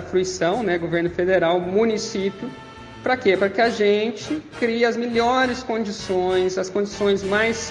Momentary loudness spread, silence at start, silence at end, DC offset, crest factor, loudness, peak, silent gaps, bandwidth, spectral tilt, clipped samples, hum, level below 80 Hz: 8 LU; 0 s; 0 s; under 0.1%; 16 dB; -21 LUFS; -6 dBFS; none; 10.5 kHz; -4.5 dB/octave; under 0.1%; none; -52 dBFS